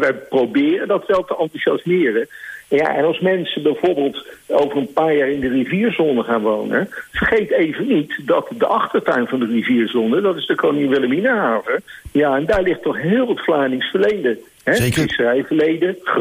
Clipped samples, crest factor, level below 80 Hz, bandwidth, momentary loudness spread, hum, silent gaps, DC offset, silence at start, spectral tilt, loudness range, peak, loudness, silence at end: under 0.1%; 14 dB; -46 dBFS; 15.5 kHz; 4 LU; none; none; under 0.1%; 0 s; -6 dB/octave; 1 LU; -4 dBFS; -18 LUFS; 0 s